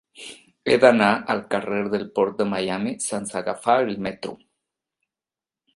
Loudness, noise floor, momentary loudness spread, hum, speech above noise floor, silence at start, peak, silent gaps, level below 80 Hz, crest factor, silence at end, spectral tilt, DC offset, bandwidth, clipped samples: -22 LUFS; under -90 dBFS; 18 LU; none; over 68 dB; 0.2 s; 0 dBFS; none; -62 dBFS; 24 dB; 1.4 s; -4.5 dB/octave; under 0.1%; 11.5 kHz; under 0.1%